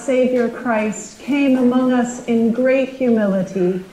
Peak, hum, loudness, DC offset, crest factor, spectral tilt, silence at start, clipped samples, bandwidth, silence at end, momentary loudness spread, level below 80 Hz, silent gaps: -6 dBFS; none; -17 LUFS; under 0.1%; 12 dB; -6 dB/octave; 0 s; under 0.1%; 11 kHz; 0 s; 5 LU; -56 dBFS; none